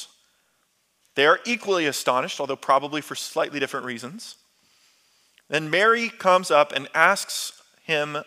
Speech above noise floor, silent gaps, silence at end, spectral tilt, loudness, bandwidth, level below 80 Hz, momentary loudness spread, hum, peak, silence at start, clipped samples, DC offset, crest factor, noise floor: 46 dB; none; 0.05 s; -2.5 dB/octave; -22 LUFS; 16 kHz; -82 dBFS; 15 LU; none; -2 dBFS; 0 s; under 0.1%; under 0.1%; 22 dB; -68 dBFS